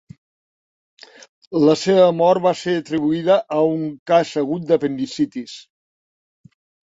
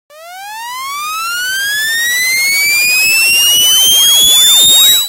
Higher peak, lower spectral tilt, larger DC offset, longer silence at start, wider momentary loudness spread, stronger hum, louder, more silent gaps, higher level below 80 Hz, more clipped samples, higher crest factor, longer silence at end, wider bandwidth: about the same, -2 dBFS vs 0 dBFS; first, -6 dB/octave vs 3 dB/octave; neither; first, 1.5 s vs 0.15 s; second, 11 LU vs 16 LU; neither; second, -18 LUFS vs -6 LUFS; first, 3.99-4.06 s vs none; second, -64 dBFS vs -48 dBFS; neither; first, 18 dB vs 10 dB; first, 1.2 s vs 0 s; second, 8 kHz vs over 20 kHz